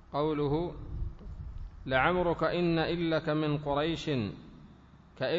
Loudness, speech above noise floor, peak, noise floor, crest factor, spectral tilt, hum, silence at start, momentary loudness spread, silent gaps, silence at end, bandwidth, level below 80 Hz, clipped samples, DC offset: -31 LUFS; 26 dB; -12 dBFS; -55 dBFS; 20 dB; -7.5 dB/octave; none; 0.1 s; 17 LU; none; 0 s; 7.8 kHz; -46 dBFS; under 0.1%; under 0.1%